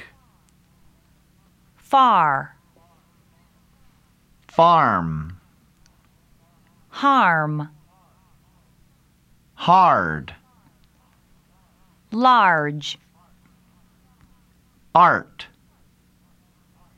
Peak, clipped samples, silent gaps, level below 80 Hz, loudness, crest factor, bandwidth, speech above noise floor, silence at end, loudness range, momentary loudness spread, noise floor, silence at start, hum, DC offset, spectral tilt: 0 dBFS; under 0.1%; none; -56 dBFS; -18 LUFS; 22 dB; 12.5 kHz; 41 dB; 1.55 s; 4 LU; 23 LU; -58 dBFS; 0 s; none; under 0.1%; -6 dB/octave